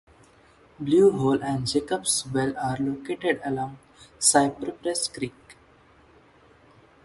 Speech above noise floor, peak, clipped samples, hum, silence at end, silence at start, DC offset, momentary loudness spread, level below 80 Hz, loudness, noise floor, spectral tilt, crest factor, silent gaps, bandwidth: 32 dB; -4 dBFS; under 0.1%; none; 1.55 s; 0.8 s; under 0.1%; 12 LU; -58 dBFS; -24 LUFS; -56 dBFS; -4 dB/octave; 22 dB; none; 12 kHz